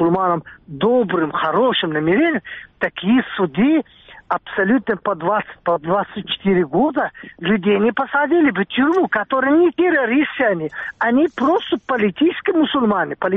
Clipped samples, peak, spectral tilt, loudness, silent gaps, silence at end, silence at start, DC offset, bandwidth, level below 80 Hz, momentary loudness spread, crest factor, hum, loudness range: under 0.1%; -4 dBFS; -4 dB/octave; -18 LUFS; none; 0 s; 0 s; under 0.1%; 4 kHz; -56 dBFS; 8 LU; 14 dB; none; 3 LU